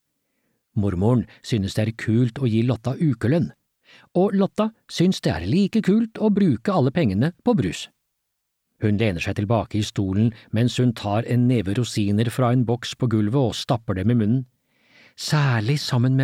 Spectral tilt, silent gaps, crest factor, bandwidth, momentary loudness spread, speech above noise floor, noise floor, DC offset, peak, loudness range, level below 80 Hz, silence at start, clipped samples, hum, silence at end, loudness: -7 dB/octave; none; 14 dB; 13.5 kHz; 6 LU; 56 dB; -77 dBFS; under 0.1%; -6 dBFS; 3 LU; -52 dBFS; 0.75 s; under 0.1%; none; 0 s; -22 LUFS